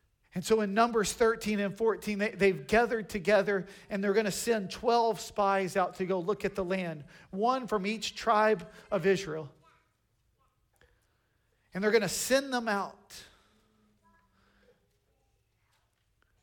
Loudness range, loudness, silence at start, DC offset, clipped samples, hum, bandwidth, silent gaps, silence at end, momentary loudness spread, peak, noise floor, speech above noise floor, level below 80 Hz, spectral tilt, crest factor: 7 LU; -30 LUFS; 0.35 s; under 0.1%; under 0.1%; none; 18 kHz; none; 3.15 s; 12 LU; -14 dBFS; -74 dBFS; 44 dB; -60 dBFS; -4.5 dB/octave; 18 dB